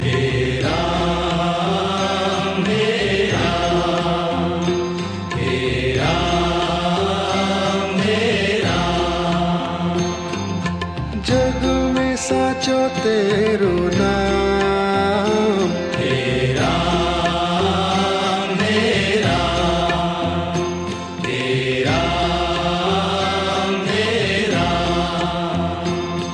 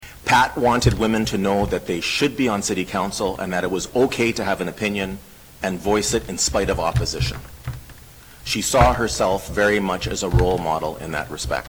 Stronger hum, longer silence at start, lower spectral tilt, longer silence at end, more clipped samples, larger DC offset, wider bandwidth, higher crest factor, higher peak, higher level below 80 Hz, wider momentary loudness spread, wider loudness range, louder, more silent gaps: neither; about the same, 0 s vs 0 s; about the same, -5 dB/octave vs -4.5 dB/octave; about the same, 0 s vs 0 s; neither; neither; second, 10 kHz vs over 20 kHz; second, 14 dB vs 22 dB; second, -4 dBFS vs 0 dBFS; about the same, -34 dBFS vs -34 dBFS; second, 5 LU vs 10 LU; about the same, 2 LU vs 3 LU; about the same, -19 LUFS vs -21 LUFS; neither